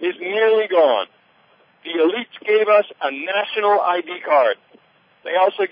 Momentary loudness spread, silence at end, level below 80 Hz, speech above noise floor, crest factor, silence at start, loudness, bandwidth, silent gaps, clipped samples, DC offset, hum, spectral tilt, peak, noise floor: 11 LU; 0.05 s; -78 dBFS; 37 dB; 16 dB; 0 s; -18 LUFS; 5.2 kHz; none; under 0.1%; under 0.1%; none; -8 dB/octave; -4 dBFS; -56 dBFS